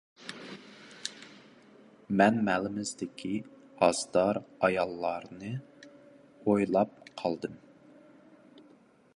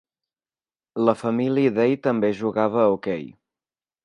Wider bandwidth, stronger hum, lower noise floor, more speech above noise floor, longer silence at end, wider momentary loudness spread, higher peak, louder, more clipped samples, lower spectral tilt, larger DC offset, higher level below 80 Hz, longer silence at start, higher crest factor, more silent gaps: about the same, 11.5 kHz vs 10.5 kHz; neither; second, -60 dBFS vs under -90 dBFS; second, 31 dB vs over 69 dB; second, 0.6 s vs 0.75 s; first, 20 LU vs 10 LU; second, -8 dBFS vs -4 dBFS; second, -30 LUFS vs -22 LUFS; neither; second, -5 dB/octave vs -8 dB/octave; neither; about the same, -68 dBFS vs -66 dBFS; second, 0.2 s vs 0.95 s; about the same, 24 dB vs 20 dB; neither